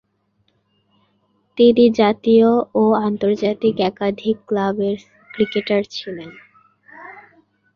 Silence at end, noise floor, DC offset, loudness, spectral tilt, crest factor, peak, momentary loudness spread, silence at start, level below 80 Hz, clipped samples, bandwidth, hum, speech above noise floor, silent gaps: 0.55 s; -65 dBFS; under 0.1%; -17 LUFS; -7 dB/octave; 16 dB; -2 dBFS; 21 LU; 1.55 s; -60 dBFS; under 0.1%; 6.8 kHz; none; 49 dB; none